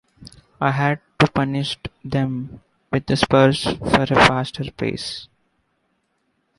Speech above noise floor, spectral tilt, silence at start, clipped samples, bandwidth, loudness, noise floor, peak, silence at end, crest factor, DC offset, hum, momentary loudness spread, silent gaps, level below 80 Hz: 50 dB; -5.5 dB/octave; 0.2 s; under 0.1%; 11.5 kHz; -20 LUFS; -69 dBFS; -2 dBFS; 1.35 s; 20 dB; under 0.1%; none; 14 LU; none; -44 dBFS